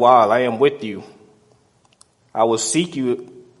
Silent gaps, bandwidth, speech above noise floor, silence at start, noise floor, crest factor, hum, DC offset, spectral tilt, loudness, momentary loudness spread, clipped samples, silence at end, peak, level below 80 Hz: none; 11.5 kHz; 40 dB; 0 s; -57 dBFS; 18 dB; none; under 0.1%; -4 dB/octave; -18 LUFS; 16 LU; under 0.1%; 0.2 s; 0 dBFS; -66 dBFS